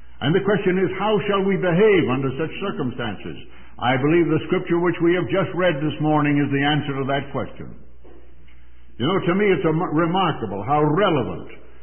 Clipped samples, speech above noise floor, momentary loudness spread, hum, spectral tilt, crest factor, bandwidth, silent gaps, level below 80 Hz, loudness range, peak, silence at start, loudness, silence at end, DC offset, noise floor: under 0.1%; 29 dB; 11 LU; none; -11.5 dB/octave; 14 dB; 3.4 kHz; none; -48 dBFS; 4 LU; -8 dBFS; 0.2 s; -21 LUFS; 0.25 s; 2%; -49 dBFS